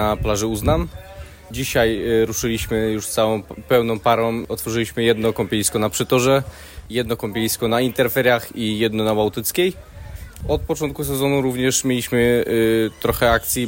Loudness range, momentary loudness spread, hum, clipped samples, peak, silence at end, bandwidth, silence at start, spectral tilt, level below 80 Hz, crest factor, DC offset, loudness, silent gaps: 2 LU; 9 LU; none; under 0.1%; -4 dBFS; 0 s; 16.5 kHz; 0 s; -4.5 dB/octave; -36 dBFS; 16 dB; under 0.1%; -20 LUFS; none